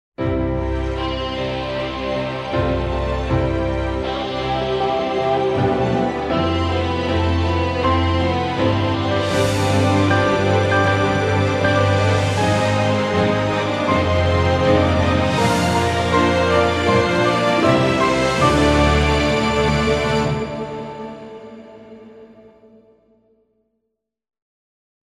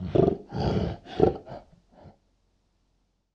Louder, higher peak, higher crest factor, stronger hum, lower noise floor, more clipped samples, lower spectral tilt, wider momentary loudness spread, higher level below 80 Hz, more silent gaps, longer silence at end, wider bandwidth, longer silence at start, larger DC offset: first, -18 LUFS vs -27 LUFS; about the same, -2 dBFS vs -4 dBFS; second, 16 dB vs 24 dB; neither; first, -77 dBFS vs -72 dBFS; neither; second, -6 dB/octave vs -9 dB/octave; second, 7 LU vs 18 LU; first, -34 dBFS vs -44 dBFS; neither; first, 2.8 s vs 1.25 s; first, 13 kHz vs 7.2 kHz; first, 0.2 s vs 0 s; neither